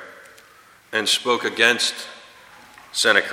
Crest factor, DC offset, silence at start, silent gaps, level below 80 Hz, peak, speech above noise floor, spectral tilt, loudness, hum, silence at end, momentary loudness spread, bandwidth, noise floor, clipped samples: 22 dB; under 0.1%; 0 s; none; -70 dBFS; 0 dBFS; 31 dB; -0.5 dB/octave; -19 LUFS; none; 0 s; 17 LU; 16.5 kHz; -51 dBFS; under 0.1%